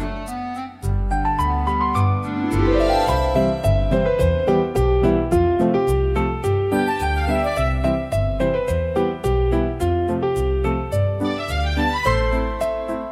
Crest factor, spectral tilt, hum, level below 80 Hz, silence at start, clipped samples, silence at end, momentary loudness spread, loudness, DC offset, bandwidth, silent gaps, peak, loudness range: 14 dB; -7 dB/octave; none; -26 dBFS; 0 s; under 0.1%; 0 s; 5 LU; -20 LUFS; under 0.1%; 15 kHz; none; -4 dBFS; 3 LU